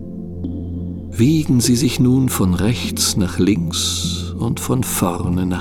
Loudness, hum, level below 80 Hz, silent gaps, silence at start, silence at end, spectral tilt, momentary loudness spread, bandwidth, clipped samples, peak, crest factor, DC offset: -18 LUFS; none; -38 dBFS; none; 0 s; 0 s; -5 dB/octave; 12 LU; 19 kHz; under 0.1%; -2 dBFS; 14 dB; under 0.1%